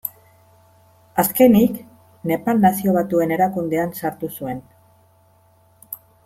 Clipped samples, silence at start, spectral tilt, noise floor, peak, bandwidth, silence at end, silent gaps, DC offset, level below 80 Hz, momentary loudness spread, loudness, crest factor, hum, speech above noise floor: under 0.1%; 0.05 s; -6.5 dB/octave; -56 dBFS; -2 dBFS; 16.5 kHz; 0.3 s; none; under 0.1%; -56 dBFS; 20 LU; -19 LUFS; 18 dB; none; 38 dB